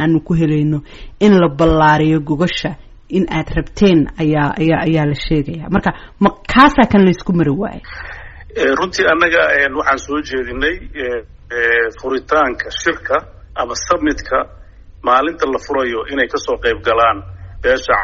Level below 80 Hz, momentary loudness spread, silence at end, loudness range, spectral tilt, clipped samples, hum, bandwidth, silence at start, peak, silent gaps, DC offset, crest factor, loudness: -32 dBFS; 12 LU; 0 s; 4 LU; -4.5 dB/octave; under 0.1%; none; 8 kHz; 0 s; 0 dBFS; none; under 0.1%; 16 dB; -15 LUFS